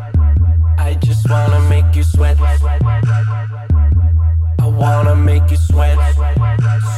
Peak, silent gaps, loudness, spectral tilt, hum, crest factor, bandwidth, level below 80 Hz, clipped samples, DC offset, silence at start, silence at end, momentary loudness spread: -2 dBFS; none; -13 LUFS; -7.5 dB/octave; none; 8 dB; 12 kHz; -16 dBFS; under 0.1%; under 0.1%; 0 s; 0 s; 3 LU